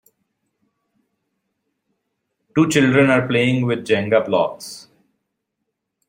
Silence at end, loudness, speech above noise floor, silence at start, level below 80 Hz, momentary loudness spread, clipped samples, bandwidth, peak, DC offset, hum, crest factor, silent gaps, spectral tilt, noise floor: 1.3 s; -17 LUFS; 60 dB; 2.55 s; -60 dBFS; 15 LU; under 0.1%; 16 kHz; -2 dBFS; under 0.1%; none; 20 dB; none; -5.5 dB/octave; -77 dBFS